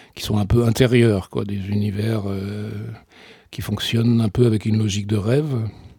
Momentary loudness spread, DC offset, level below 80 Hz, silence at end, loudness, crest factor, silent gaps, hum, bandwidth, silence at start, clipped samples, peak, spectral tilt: 14 LU; under 0.1%; -40 dBFS; 0.1 s; -20 LUFS; 18 dB; none; none; 18 kHz; 0.15 s; under 0.1%; -2 dBFS; -6.5 dB/octave